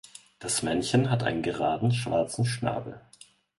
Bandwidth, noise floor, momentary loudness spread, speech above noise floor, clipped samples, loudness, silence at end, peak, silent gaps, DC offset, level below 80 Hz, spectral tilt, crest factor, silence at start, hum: 11.5 kHz; -56 dBFS; 12 LU; 29 dB; under 0.1%; -27 LUFS; 0.6 s; -10 dBFS; none; under 0.1%; -56 dBFS; -5 dB/octave; 18 dB; 0.4 s; none